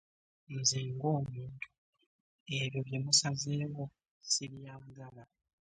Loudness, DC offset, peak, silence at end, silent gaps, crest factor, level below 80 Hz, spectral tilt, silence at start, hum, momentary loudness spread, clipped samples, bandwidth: -33 LUFS; under 0.1%; -14 dBFS; 0.5 s; 1.78-1.93 s, 2.06-2.46 s, 4.11-4.21 s; 24 dB; -70 dBFS; -3 dB/octave; 0.5 s; none; 22 LU; under 0.1%; 10 kHz